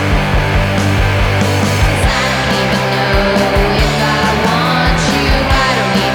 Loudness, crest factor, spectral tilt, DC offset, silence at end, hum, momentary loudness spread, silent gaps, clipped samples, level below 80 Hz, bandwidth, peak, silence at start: -12 LUFS; 12 dB; -5 dB/octave; under 0.1%; 0 s; none; 1 LU; none; under 0.1%; -20 dBFS; over 20 kHz; 0 dBFS; 0 s